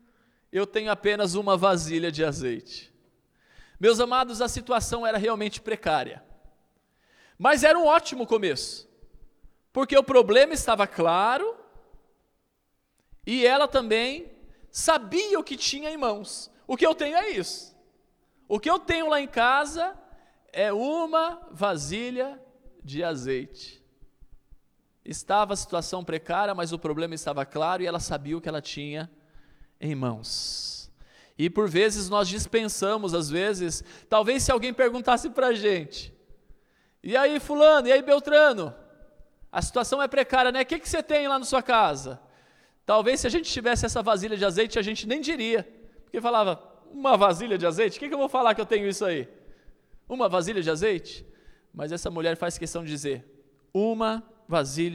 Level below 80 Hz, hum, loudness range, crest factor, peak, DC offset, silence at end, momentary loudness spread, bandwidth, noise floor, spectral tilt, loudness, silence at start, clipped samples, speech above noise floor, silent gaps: -50 dBFS; none; 8 LU; 20 dB; -6 dBFS; under 0.1%; 0 s; 15 LU; 15.5 kHz; -73 dBFS; -3.5 dB/octave; -25 LUFS; 0.55 s; under 0.1%; 48 dB; none